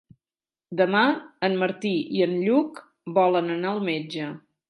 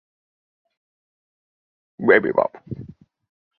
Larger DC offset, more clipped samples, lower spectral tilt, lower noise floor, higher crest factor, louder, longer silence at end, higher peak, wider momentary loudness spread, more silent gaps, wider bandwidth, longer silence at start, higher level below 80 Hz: neither; neither; second, -7 dB/octave vs -9.5 dB/octave; about the same, under -90 dBFS vs under -90 dBFS; second, 18 dB vs 24 dB; second, -24 LUFS vs -19 LUFS; second, 0.3 s vs 0.75 s; second, -8 dBFS vs -2 dBFS; second, 12 LU vs 20 LU; neither; first, 11.5 kHz vs 4.4 kHz; second, 0.7 s vs 2 s; second, -76 dBFS vs -60 dBFS